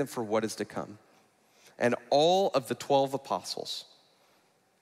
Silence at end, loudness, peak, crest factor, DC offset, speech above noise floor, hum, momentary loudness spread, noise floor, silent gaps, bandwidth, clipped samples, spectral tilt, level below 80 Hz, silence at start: 1 s; -29 LUFS; -12 dBFS; 18 dB; under 0.1%; 38 dB; none; 13 LU; -67 dBFS; none; 15.5 kHz; under 0.1%; -4.5 dB/octave; -80 dBFS; 0 s